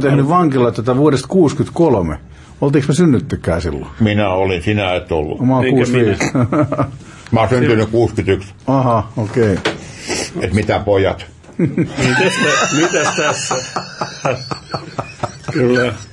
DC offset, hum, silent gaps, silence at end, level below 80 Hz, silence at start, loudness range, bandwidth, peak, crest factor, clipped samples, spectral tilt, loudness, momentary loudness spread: under 0.1%; none; none; 0.05 s; -40 dBFS; 0 s; 2 LU; 11.5 kHz; -2 dBFS; 14 dB; under 0.1%; -5.5 dB/octave; -15 LUFS; 11 LU